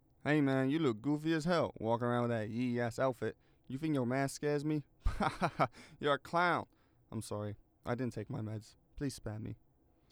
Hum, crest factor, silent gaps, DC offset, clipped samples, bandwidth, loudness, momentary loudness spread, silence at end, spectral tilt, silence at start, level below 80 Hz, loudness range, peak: none; 18 dB; none; under 0.1%; under 0.1%; over 20 kHz; -36 LUFS; 13 LU; 0.55 s; -6.5 dB/octave; 0.25 s; -52 dBFS; 5 LU; -18 dBFS